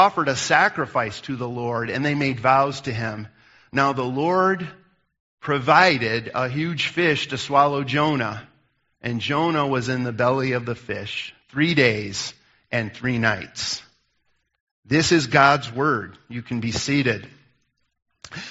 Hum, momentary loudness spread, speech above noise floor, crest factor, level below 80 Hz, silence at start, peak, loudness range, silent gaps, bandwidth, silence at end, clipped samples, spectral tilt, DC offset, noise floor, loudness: none; 13 LU; 48 dB; 22 dB; -58 dBFS; 0 s; 0 dBFS; 4 LU; 5.20-5.38 s, 14.60-14.83 s; 8 kHz; 0 s; under 0.1%; -3.5 dB/octave; under 0.1%; -70 dBFS; -21 LUFS